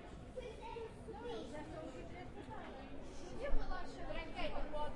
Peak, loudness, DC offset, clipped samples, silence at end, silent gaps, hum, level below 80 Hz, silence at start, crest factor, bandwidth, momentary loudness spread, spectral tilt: -22 dBFS; -48 LUFS; under 0.1%; under 0.1%; 0 s; none; none; -46 dBFS; 0 s; 20 dB; 9.8 kHz; 7 LU; -5.5 dB/octave